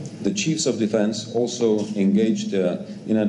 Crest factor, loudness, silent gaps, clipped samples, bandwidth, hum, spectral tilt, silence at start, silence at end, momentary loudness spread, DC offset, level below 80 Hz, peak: 14 dB; -22 LUFS; none; under 0.1%; 10.5 kHz; none; -5 dB/octave; 0 s; 0 s; 5 LU; under 0.1%; -64 dBFS; -8 dBFS